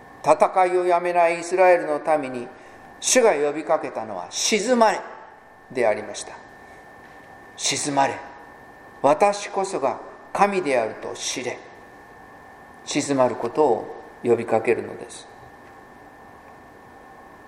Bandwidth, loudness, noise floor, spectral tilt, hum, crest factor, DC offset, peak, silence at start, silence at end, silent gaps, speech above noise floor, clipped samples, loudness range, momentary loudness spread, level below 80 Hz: 15.5 kHz; -22 LUFS; -46 dBFS; -3 dB/octave; none; 22 dB; under 0.1%; -2 dBFS; 0 s; 0.1 s; none; 25 dB; under 0.1%; 6 LU; 19 LU; -64 dBFS